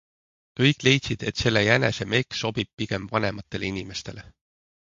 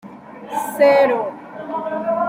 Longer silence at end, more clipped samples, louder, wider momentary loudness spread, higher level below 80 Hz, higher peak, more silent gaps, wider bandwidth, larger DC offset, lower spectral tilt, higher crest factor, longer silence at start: first, 0.55 s vs 0 s; neither; second, -24 LUFS vs -18 LUFS; second, 15 LU vs 21 LU; first, -50 dBFS vs -68 dBFS; about the same, -4 dBFS vs -2 dBFS; first, 2.73-2.77 s vs none; second, 7.8 kHz vs 16 kHz; neither; about the same, -5 dB/octave vs -4.5 dB/octave; first, 22 dB vs 16 dB; first, 0.55 s vs 0.05 s